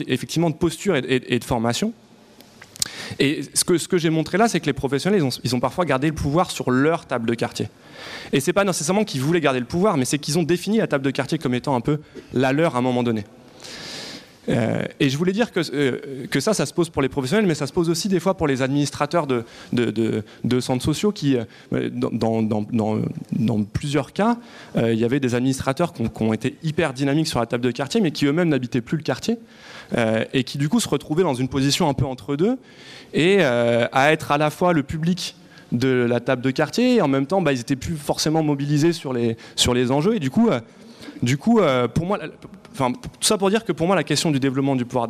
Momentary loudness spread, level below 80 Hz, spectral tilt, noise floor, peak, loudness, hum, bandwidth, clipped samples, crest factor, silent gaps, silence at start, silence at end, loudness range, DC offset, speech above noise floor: 7 LU; -50 dBFS; -5 dB/octave; -49 dBFS; -2 dBFS; -21 LUFS; none; 15.5 kHz; under 0.1%; 20 dB; none; 0 s; 0 s; 3 LU; under 0.1%; 28 dB